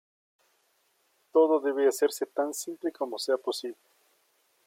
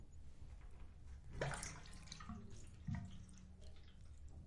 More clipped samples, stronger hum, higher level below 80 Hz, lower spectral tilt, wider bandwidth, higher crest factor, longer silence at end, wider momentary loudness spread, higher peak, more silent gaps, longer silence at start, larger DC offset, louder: neither; neither; second, -88 dBFS vs -58 dBFS; second, -2 dB/octave vs -4.5 dB/octave; first, 16.5 kHz vs 11.5 kHz; about the same, 18 dB vs 22 dB; first, 0.95 s vs 0 s; second, 10 LU vs 15 LU; first, -12 dBFS vs -28 dBFS; neither; first, 1.35 s vs 0 s; neither; first, -28 LUFS vs -53 LUFS